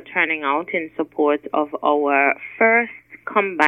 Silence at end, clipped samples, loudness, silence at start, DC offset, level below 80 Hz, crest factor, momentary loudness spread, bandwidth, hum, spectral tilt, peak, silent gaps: 0 s; under 0.1%; -20 LUFS; 0.05 s; under 0.1%; -70 dBFS; 20 dB; 9 LU; 9.2 kHz; none; -5.5 dB/octave; 0 dBFS; none